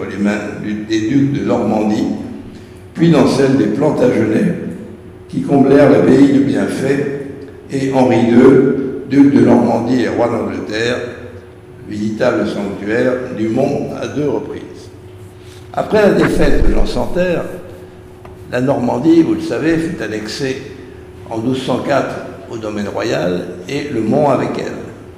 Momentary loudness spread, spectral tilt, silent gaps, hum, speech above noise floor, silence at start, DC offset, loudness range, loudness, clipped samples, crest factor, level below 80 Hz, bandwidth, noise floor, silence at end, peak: 19 LU; -7 dB/octave; none; none; 22 dB; 0 s; under 0.1%; 7 LU; -14 LUFS; under 0.1%; 14 dB; -28 dBFS; 13 kHz; -35 dBFS; 0 s; 0 dBFS